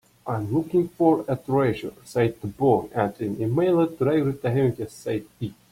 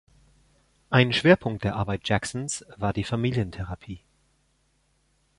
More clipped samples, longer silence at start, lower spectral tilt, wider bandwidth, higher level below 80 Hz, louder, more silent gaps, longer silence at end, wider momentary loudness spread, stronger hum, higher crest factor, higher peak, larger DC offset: neither; second, 0.25 s vs 0.9 s; first, -8 dB/octave vs -5.5 dB/octave; first, 16 kHz vs 11.5 kHz; second, -56 dBFS vs -48 dBFS; about the same, -24 LUFS vs -25 LUFS; neither; second, 0.2 s vs 1.4 s; second, 9 LU vs 16 LU; neither; about the same, 18 dB vs 22 dB; about the same, -6 dBFS vs -6 dBFS; neither